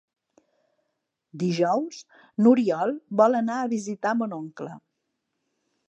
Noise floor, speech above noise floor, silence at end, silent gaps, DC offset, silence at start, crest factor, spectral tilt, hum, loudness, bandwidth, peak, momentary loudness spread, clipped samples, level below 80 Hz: -79 dBFS; 55 dB; 1.1 s; none; under 0.1%; 1.35 s; 20 dB; -6.5 dB/octave; none; -24 LUFS; 8.4 kHz; -6 dBFS; 17 LU; under 0.1%; -82 dBFS